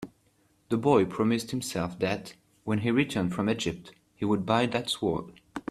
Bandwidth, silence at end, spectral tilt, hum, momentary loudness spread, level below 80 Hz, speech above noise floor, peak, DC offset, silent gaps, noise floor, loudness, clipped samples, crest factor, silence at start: 14 kHz; 0.1 s; -5.5 dB/octave; none; 16 LU; -60 dBFS; 39 dB; -8 dBFS; under 0.1%; none; -67 dBFS; -28 LUFS; under 0.1%; 20 dB; 0 s